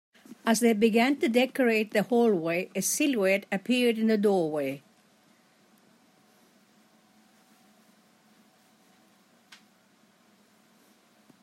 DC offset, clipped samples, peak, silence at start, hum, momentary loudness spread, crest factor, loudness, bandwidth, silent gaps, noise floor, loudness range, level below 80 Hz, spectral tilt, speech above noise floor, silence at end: under 0.1%; under 0.1%; -10 dBFS; 0.45 s; none; 7 LU; 20 dB; -26 LUFS; 16 kHz; none; -63 dBFS; 8 LU; -80 dBFS; -4 dB/octave; 38 dB; 6.65 s